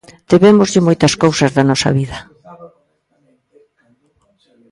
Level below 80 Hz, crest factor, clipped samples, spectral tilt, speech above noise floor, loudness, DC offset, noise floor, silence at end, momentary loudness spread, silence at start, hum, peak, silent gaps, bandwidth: -46 dBFS; 16 dB; under 0.1%; -5.5 dB/octave; 49 dB; -12 LUFS; under 0.1%; -60 dBFS; 2.05 s; 10 LU; 0.3 s; none; 0 dBFS; none; 11.5 kHz